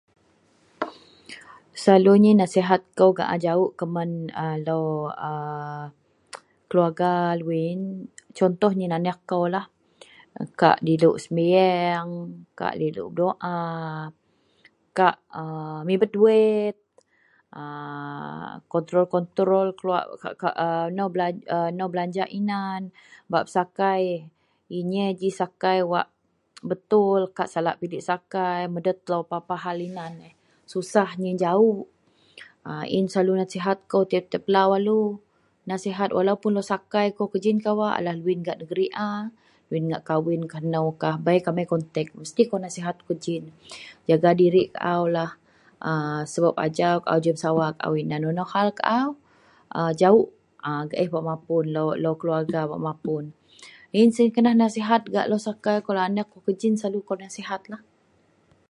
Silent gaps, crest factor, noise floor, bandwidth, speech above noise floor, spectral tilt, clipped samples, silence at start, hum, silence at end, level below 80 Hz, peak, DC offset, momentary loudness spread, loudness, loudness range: none; 22 dB; -63 dBFS; 11.5 kHz; 40 dB; -6.5 dB/octave; under 0.1%; 0.8 s; none; 0.95 s; -70 dBFS; -2 dBFS; under 0.1%; 15 LU; -24 LUFS; 5 LU